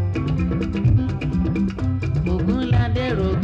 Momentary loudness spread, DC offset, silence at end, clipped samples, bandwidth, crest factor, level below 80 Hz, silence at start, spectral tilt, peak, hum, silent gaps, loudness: 4 LU; under 0.1%; 0 s; under 0.1%; 7.4 kHz; 12 dB; -30 dBFS; 0 s; -9 dB/octave; -8 dBFS; none; none; -21 LUFS